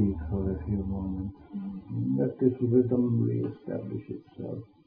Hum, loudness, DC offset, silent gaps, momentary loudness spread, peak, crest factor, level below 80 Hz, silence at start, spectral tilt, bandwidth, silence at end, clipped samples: none; -30 LUFS; under 0.1%; none; 14 LU; -10 dBFS; 20 dB; -46 dBFS; 0 s; -14 dB/octave; 3.4 kHz; 0.2 s; under 0.1%